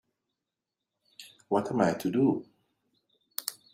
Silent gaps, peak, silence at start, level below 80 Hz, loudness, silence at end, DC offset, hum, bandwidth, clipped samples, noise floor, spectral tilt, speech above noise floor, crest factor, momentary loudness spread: none; -10 dBFS; 1.2 s; -70 dBFS; -29 LUFS; 0.2 s; under 0.1%; none; 16 kHz; under 0.1%; -88 dBFS; -6 dB/octave; 61 dB; 22 dB; 23 LU